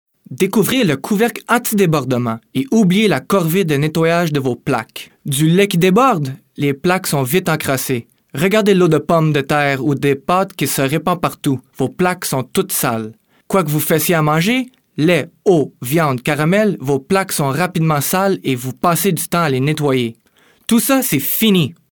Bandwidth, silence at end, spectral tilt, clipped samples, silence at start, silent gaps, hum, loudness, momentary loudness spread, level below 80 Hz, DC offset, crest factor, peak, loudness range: 20 kHz; 0.2 s; -5 dB/octave; under 0.1%; 0.3 s; none; none; -16 LUFS; 8 LU; -54 dBFS; 0.1%; 14 dB; -2 dBFS; 2 LU